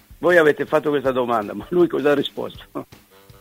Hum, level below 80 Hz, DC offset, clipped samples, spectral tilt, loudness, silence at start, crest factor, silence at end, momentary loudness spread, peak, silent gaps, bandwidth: none; -52 dBFS; under 0.1%; under 0.1%; -6 dB/octave; -19 LUFS; 0.1 s; 20 dB; 0.55 s; 17 LU; 0 dBFS; none; 16 kHz